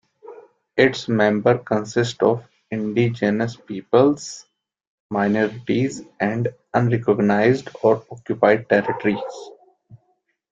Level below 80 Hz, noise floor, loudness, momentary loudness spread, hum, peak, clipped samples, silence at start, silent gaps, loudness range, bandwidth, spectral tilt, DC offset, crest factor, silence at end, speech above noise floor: -60 dBFS; -68 dBFS; -20 LUFS; 11 LU; none; 0 dBFS; under 0.1%; 0.25 s; 4.87-5.09 s; 3 LU; 7.8 kHz; -6.5 dB/octave; under 0.1%; 20 dB; 0.55 s; 49 dB